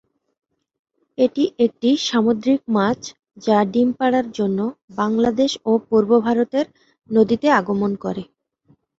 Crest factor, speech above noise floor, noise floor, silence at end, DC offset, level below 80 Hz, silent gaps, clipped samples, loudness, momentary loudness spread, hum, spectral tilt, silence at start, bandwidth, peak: 18 dB; 41 dB; -59 dBFS; 0.75 s; under 0.1%; -58 dBFS; 4.84-4.88 s; under 0.1%; -19 LUFS; 10 LU; none; -5.5 dB/octave; 1.2 s; 7.8 kHz; -2 dBFS